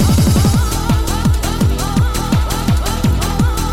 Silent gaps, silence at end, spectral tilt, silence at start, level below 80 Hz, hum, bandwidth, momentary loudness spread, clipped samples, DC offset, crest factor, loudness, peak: none; 0 s; -5.5 dB/octave; 0 s; -18 dBFS; none; 17 kHz; 4 LU; under 0.1%; under 0.1%; 14 dB; -15 LUFS; 0 dBFS